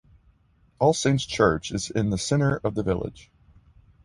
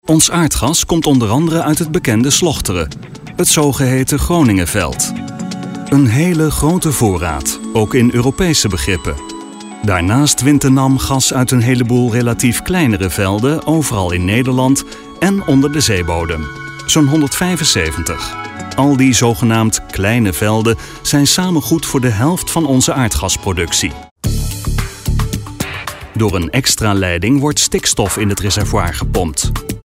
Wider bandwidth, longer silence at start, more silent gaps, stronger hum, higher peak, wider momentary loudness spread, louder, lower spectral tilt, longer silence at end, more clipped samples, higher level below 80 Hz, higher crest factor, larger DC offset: second, 11.5 kHz vs 16.5 kHz; first, 0.8 s vs 0.05 s; second, none vs 24.11-24.16 s; neither; second, -6 dBFS vs 0 dBFS; second, 7 LU vs 10 LU; second, -24 LUFS vs -13 LUFS; about the same, -5.5 dB/octave vs -4.5 dB/octave; first, 0.85 s vs 0.05 s; neither; second, -46 dBFS vs -28 dBFS; first, 20 dB vs 12 dB; neither